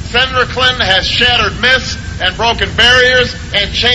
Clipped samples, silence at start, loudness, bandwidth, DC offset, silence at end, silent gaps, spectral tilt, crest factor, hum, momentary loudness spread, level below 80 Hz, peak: 0.3%; 0 s; -10 LUFS; 11 kHz; under 0.1%; 0 s; none; -3 dB/octave; 12 dB; none; 7 LU; -28 dBFS; 0 dBFS